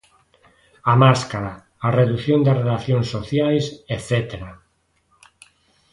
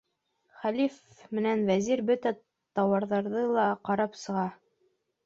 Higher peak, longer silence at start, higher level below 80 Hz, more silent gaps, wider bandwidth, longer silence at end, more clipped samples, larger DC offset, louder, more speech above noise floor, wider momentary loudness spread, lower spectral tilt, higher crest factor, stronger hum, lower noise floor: first, -2 dBFS vs -14 dBFS; first, 0.85 s vs 0.6 s; first, -48 dBFS vs -72 dBFS; neither; first, 11.5 kHz vs 7.8 kHz; first, 1.4 s vs 0.7 s; neither; neither; first, -19 LUFS vs -29 LUFS; about the same, 46 dB vs 46 dB; first, 15 LU vs 9 LU; about the same, -7 dB/octave vs -6 dB/octave; about the same, 20 dB vs 16 dB; neither; second, -65 dBFS vs -74 dBFS